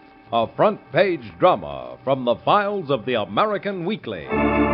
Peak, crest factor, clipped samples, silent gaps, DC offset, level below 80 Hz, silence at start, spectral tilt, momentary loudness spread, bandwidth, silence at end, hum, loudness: -2 dBFS; 18 dB; under 0.1%; none; under 0.1%; -44 dBFS; 0.3 s; -4 dB/octave; 8 LU; 5.4 kHz; 0 s; none; -21 LUFS